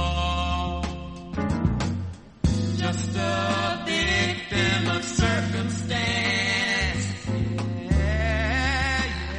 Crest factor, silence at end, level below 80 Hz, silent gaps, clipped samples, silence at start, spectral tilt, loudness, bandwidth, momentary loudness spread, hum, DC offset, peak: 16 dB; 0 s; -32 dBFS; none; under 0.1%; 0 s; -4.5 dB/octave; -25 LUFS; 10.5 kHz; 7 LU; none; under 0.1%; -8 dBFS